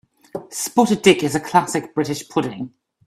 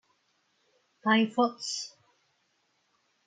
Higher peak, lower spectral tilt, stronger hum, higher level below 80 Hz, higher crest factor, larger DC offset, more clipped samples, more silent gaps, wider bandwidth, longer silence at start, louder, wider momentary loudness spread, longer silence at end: first, 0 dBFS vs -12 dBFS; about the same, -4.5 dB/octave vs -3.5 dB/octave; neither; first, -58 dBFS vs -84 dBFS; about the same, 20 dB vs 20 dB; neither; neither; neither; first, 15.5 kHz vs 9.4 kHz; second, 0.35 s vs 1.05 s; first, -19 LUFS vs -28 LUFS; first, 19 LU vs 11 LU; second, 0.4 s vs 1.4 s